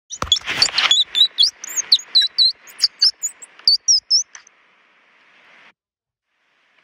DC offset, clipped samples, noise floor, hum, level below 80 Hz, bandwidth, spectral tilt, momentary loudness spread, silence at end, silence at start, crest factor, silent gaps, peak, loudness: under 0.1%; under 0.1%; under -90 dBFS; none; -52 dBFS; 16 kHz; 2 dB/octave; 7 LU; 2.6 s; 0.1 s; 18 dB; none; -2 dBFS; -15 LUFS